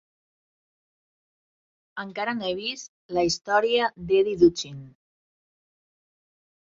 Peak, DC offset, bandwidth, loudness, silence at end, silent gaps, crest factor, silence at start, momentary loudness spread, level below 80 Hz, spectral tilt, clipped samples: -6 dBFS; under 0.1%; 7.8 kHz; -24 LUFS; 1.85 s; 2.88-3.09 s; 22 dB; 1.95 s; 17 LU; -60 dBFS; -4 dB/octave; under 0.1%